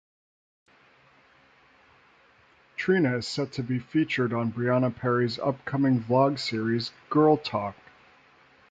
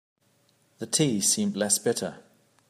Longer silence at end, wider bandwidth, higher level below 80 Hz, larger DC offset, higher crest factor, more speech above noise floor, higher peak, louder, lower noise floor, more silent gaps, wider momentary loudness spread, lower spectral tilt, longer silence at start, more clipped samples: first, 1 s vs 0.5 s; second, 9.2 kHz vs 15.5 kHz; first, -64 dBFS vs -74 dBFS; neither; about the same, 18 dB vs 22 dB; second, 34 dB vs 40 dB; about the same, -10 dBFS vs -8 dBFS; about the same, -26 LUFS vs -25 LUFS; second, -60 dBFS vs -66 dBFS; neither; second, 8 LU vs 12 LU; first, -7 dB/octave vs -3 dB/octave; first, 2.8 s vs 0.8 s; neither